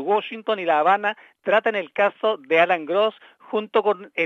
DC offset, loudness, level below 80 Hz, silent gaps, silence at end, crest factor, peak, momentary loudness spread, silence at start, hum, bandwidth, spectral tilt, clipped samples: under 0.1%; -22 LUFS; -84 dBFS; none; 0 s; 18 dB; -4 dBFS; 8 LU; 0 s; none; 7 kHz; -5.5 dB/octave; under 0.1%